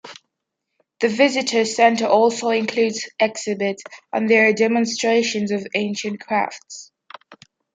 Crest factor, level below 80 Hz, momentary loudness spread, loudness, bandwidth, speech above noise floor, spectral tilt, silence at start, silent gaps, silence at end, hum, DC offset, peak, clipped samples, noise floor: 18 dB; -72 dBFS; 12 LU; -19 LUFS; 9.4 kHz; 60 dB; -3.5 dB/octave; 0.05 s; none; 0.4 s; none; under 0.1%; -2 dBFS; under 0.1%; -79 dBFS